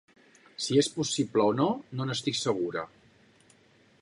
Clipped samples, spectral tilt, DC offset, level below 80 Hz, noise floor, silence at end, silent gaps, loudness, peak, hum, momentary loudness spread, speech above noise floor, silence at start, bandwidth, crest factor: under 0.1%; -4.5 dB/octave; under 0.1%; -72 dBFS; -62 dBFS; 1.15 s; none; -28 LUFS; -12 dBFS; none; 11 LU; 34 dB; 0.6 s; 11.5 kHz; 18 dB